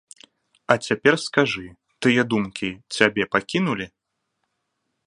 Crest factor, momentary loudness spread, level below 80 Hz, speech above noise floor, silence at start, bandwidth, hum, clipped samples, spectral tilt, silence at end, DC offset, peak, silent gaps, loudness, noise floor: 24 dB; 11 LU; -60 dBFS; 55 dB; 0.7 s; 11 kHz; none; under 0.1%; -5 dB/octave; 1.2 s; under 0.1%; 0 dBFS; none; -22 LUFS; -76 dBFS